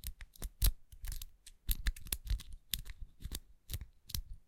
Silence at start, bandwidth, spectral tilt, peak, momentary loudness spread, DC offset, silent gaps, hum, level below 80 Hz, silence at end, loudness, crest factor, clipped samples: 0.05 s; 17 kHz; -2.5 dB/octave; -14 dBFS; 14 LU; under 0.1%; none; none; -42 dBFS; 0.05 s; -42 LUFS; 26 dB; under 0.1%